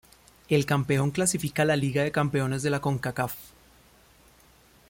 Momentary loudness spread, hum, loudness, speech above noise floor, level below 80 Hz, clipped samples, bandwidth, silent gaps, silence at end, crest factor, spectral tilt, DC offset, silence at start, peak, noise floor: 6 LU; none; -26 LUFS; 32 dB; -58 dBFS; under 0.1%; 17 kHz; none; 1.4 s; 18 dB; -5 dB/octave; under 0.1%; 0.5 s; -8 dBFS; -58 dBFS